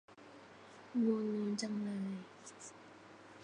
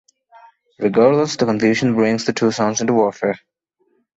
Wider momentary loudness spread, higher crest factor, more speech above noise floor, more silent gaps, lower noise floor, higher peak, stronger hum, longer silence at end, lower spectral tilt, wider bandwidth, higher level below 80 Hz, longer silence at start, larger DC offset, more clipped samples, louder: first, 22 LU vs 9 LU; about the same, 18 dB vs 18 dB; second, 20 dB vs 49 dB; neither; second, -58 dBFS vs -65 dBFS; second, -24 dBFS vs -2 dBFS; neither; second, 0 s vs 0.8 s; about the same, -5.5 dB/octave vs -5 dB/octave; first, 10 kHz vs 8 kHz; second, -84 dBFS vs -58 dBFS; second, 0.1 s vs 0.8 s; neither; neither; second, -38 LUFS vs -17 LUFS